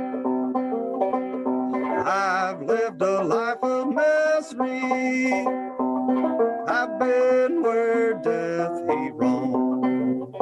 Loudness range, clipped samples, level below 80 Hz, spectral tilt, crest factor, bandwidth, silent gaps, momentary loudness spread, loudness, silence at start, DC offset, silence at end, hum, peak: 2 LU; under 0.1%; -72 dBFS; -6 dB/octave; 16 dB; 9.6 kHz; none; 5 LU; -23 LUFS; 0 s; under 0.1%; 0 s; none; -8 dBFS